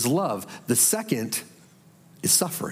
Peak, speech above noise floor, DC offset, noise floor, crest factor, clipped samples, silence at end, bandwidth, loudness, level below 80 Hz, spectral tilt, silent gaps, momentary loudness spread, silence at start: -6 dBFS; 29 dB; under 0.1%; -54 dBFS; 20 dB; under 0.1%; 0 s; 16.5 kHz; -23 LUFS; -76 dBFS; -3 dB/octave; none; 11 LU; 0 s